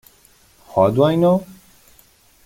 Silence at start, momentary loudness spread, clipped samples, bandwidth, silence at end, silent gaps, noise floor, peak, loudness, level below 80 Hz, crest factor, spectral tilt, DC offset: 0.75 s; 7 LU; under 0.1%; 17 kHz; 0.95 s; none; -53 dBFS; -2 dBFS; -17 LUFS; -54 dBFS; 18 dB; -8 dB/octave; under 0.1%